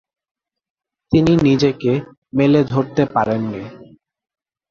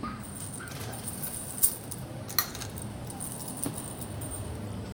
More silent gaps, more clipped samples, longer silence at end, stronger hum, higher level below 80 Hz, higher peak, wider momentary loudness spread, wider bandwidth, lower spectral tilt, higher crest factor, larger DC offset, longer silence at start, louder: first, 2.18-2.22 s vs none; neither; first, 0.95 s vs 0.05 s; neither; about the same, -46 dBFS vs -50 dBFS; about the same, -2 dBFS vs -4 dBFS; about the same, 11 LU vs 13 LU; second, 7.4 kHz vs over 20 kHz; first, -7.5 dB/octave vs -3 dB/octave; second, 18 dB vs 30 dB; neither; first, 1.1 s vs 0 s; first, -17 LUFS vs -33 LUFS